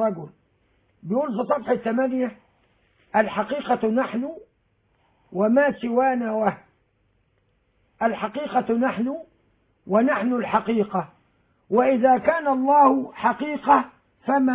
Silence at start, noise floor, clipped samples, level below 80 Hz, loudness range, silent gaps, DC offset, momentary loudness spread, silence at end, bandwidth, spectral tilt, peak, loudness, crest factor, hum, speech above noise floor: 0 s; -67 dBFS; under 0.1%; -64 dBFS; 6 LU; none; under 0.1%; 12 LU; 0 s; 4 kHz; -10 dB/octave; -6 dBFS; -22 LUFS; 18 dB; none; 45 dB